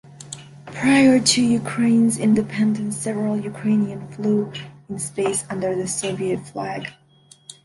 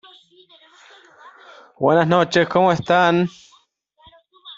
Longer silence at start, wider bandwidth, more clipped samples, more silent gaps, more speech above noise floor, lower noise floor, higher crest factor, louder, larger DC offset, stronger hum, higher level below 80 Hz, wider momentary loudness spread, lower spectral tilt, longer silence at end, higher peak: second, 0.1 s vs 1.25 s; first, 11.5 kHz vs 7.8 kHz; neither; neither; second, 32 dB vs 42 dB; second, -52 dBFS vs -58 dBFS; about the same, 20 dB vs 18 dB; second, -20 LUFS vs -17 LUFS; neither; neither; about the same, -60 dBFS vs -60 dBFS; first, 19 LU vs 6 LU; second, -4.5 dB/octave vs -6 dB/octave; about the same, 0.15 s vs 0.05 s; about the same, -2 dBFS vs -2 dBFS